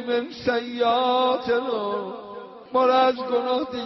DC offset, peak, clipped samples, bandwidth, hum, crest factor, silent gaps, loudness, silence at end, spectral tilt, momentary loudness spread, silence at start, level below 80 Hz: under 0.1%; -10 dBFS; under 0.1%; 6 kHz; none; 14 dB; none; -23 LUFS; 0 s; -1.5 dB/octave; 13 LU; 0 s; -64 dBFS